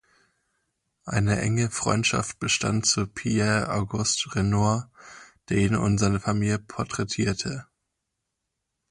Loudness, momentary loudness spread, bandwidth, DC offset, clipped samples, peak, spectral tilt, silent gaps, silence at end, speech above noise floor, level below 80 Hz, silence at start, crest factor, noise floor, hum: -25 LUFS; 7 LU; 11.5 kHz; under 0.1%; under 0.1%; -8 dBFS; -4.5 dB/octave; none; 1.3 s; 57 dB; -48 dBFS; 1.05 s; 18 dB; -81 dBFS; none